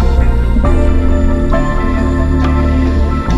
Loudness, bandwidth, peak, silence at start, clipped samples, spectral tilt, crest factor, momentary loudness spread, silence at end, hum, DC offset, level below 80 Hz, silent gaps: -14 LUFS; 7.6 kHz; 0 dBFS; 0 s; under 0.1%; -8 dB/octave; 10 dB; 2 LU; 0 s; none; under 0.1%; -12 dBFS; none